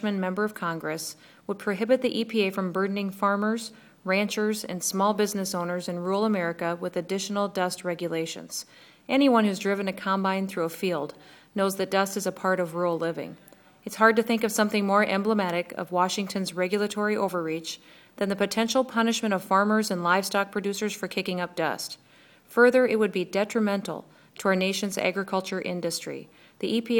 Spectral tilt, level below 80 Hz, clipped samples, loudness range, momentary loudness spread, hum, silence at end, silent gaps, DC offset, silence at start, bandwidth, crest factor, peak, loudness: -4.5 dB/octave; -74 dBFS; under 0.1%; 3 LU; 11 LU; none; 0 s; none; under 0.1%; 0 s; 19.5 kHz; 22 dB; -4 dBFS; -26 LUFS